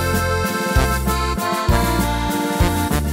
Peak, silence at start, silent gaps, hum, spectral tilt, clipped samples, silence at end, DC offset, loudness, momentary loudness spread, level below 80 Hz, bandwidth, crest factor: -2 dBFS; 0 s; none; none; -5 dB/octave; under 0.1%; 0 s; under 0.1%; -19 LUFS; 3 LU; -24 dBFS; 16 kHz; 16 dB